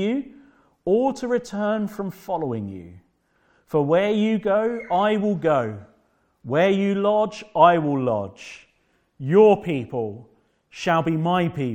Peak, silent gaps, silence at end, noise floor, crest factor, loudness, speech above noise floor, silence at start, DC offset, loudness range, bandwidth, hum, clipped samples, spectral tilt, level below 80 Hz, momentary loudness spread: -2 dBFS; none; 0 s; -66 dBFS; 20 dB; -22 LUFS; 45 dB; 0 s; under 0.1%; 5 LU; 16 kHz; none; under 0.1%; -7 dB/octave; -60 dBFS; 16 LU